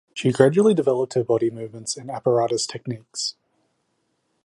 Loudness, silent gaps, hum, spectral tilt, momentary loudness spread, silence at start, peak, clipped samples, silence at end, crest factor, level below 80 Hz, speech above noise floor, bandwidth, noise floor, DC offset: -22 LUFS; none; none; -5 dB/octave; 13 LU; 0.15 s; -2 dBFS; under 0.1%; 1.15 s; 22 dB; -66 dBFS; 50 dB; 11.5 kHz; -71 dBFS; under 0.1%